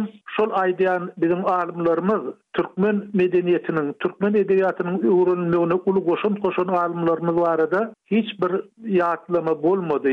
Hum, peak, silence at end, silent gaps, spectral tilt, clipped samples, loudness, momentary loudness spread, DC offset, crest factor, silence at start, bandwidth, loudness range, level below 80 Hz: none; -10 dBFS; 0 s; none; -9 dB/octave; under 0.1%; -21 LUFS; 5 LU; under 0.1%; 12 dB; 0 s; 4.7 kHz; 2 LU; -64 dBFS